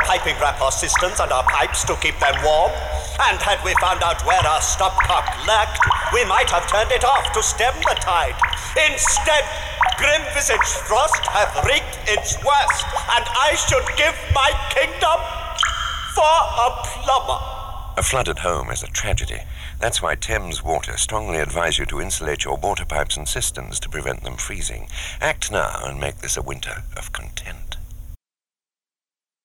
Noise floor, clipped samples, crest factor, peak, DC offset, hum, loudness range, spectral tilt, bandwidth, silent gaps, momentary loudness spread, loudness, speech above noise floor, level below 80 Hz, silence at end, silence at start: under -90 dBFS; under 0.1%; 14 dB; -6 dBFS; under 0.1%; none; 8 LU; -2 dB/octave; 18.5 kHz; none; 11 LU; -19 LUFS; over 70 dB; -30 dBFS; 1.3 s; 0 s